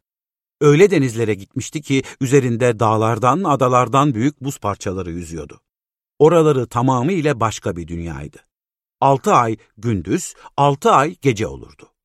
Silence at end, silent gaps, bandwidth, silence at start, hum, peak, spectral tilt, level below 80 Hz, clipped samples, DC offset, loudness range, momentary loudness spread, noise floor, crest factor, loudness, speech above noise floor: 0.4 s; none; 14 kHz; 0.6 s; none; -2 dBFS; -6 dB/octave; -48 dBFS; under 0.1%; under 0.1%; 3 LU; 14 LU; under -90 dBFS; 16 dB; -17 LUFS; over 73 dB